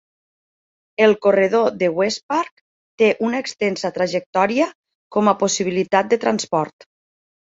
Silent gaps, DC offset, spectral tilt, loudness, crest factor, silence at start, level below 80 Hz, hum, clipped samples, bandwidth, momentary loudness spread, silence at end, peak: 2.23-2.29 s, 2.51-2.98 s, 4.26-4.33 s, 4.75-4.83 s, 4.95-5.10 s; under 0.1%; -4 dB/octave; -19 LUFS; 18 dB; 1 s; -64 dBFS; none; under 0.1%; 8 kHz; 7 LU; 0.9 s; -2 dBFS